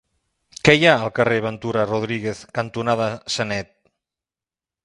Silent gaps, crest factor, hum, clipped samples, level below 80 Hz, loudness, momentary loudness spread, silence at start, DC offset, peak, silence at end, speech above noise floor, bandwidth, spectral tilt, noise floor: none; 22 dB; none; under 0.1%; -52 dBFS; -20 LUFS; 13 LU; 0.65 s; under 0.1%; 0 dBFS; 1.2 s; over 70 dB; 11.5 kHz; -5 dB/octave; under -90 dBFS